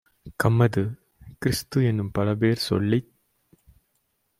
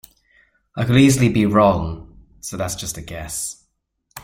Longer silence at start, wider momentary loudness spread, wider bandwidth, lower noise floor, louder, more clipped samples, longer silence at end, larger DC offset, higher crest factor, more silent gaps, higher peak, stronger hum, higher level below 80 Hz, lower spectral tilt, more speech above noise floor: second, 0.25 s vs 0.75 s; second, 9 LU vs 18 LU; about the same, 16 kHz vs 16.5 kHz; about the same, -72 dBFS vs -69 dBFS; second, -24 LUFS vs -18 LUFS; neither; first, 1.35 s vs 0.05 s; neither; about the same, 20 dB vs 18 dB; neither; second, -6 dBFS vs -2 dBFS; neither; second, -52 dBFS vs -42 dBFS; about the same, -6.5 dB/octave vs -5.5 dB/octave; about the same, 50 dB vs 51 dB